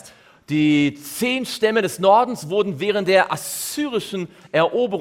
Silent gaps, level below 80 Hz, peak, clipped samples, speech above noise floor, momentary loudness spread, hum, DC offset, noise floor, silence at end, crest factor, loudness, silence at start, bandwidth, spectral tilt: none; -62 dBFS; -4 dBFS; under 0.1%; 26 dB; 9 LU; none; under 0.1%; -46 dBFS; 0 s; 16 dB; -20 LUFS; 0.05 s; 17 kHz; -4.5 dB/octave